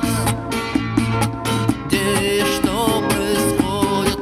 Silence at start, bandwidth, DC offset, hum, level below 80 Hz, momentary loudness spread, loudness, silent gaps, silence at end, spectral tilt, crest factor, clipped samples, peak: 0 s; 16 kHz; under 0.1%; none; -36 dBFS; 3 LU; -19 LUFS; none; 0 s; -4.5 dB/octave; 16 dB; under 0.1%; -2 dBFS